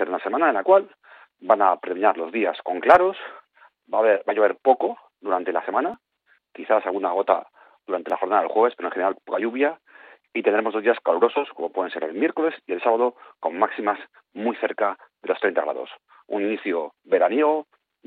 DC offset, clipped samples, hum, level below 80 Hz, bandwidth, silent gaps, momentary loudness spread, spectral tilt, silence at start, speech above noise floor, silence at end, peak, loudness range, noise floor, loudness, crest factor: under 0.1%; under 0.1%; none; -70 dBFS; 5.2 kHz; none; 11 LU; -6.5 dB/octave; 0 s; 42 dB; 0.45 s; -2 dBFS; 5 LU; -64 dBFS; -22 LUFS; 20 dB